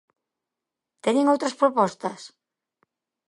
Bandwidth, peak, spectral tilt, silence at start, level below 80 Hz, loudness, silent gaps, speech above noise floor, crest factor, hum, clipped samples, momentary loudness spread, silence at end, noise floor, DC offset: 11.5 kHz; -6 dBFS; -5 dB/octave; 1.05 s; -78 dBFS; -23 LUFS; none; 64 dB; 20 dB; none; under 0.1%; 12 LU; 1 s; -87 dBFS; under 0.1%